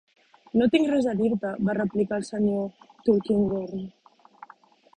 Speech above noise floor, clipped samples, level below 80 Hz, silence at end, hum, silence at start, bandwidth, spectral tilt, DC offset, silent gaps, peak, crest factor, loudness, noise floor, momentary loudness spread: 31 dB; under 0.1%; -58 dBFS; 1.05 s; none; 0.55 s; 9.8 kHz; -7 dB/octave; under 0.1%; none; -8 dBFS; 18 dB; -25 LUFS; -55 dBFS; 11 LU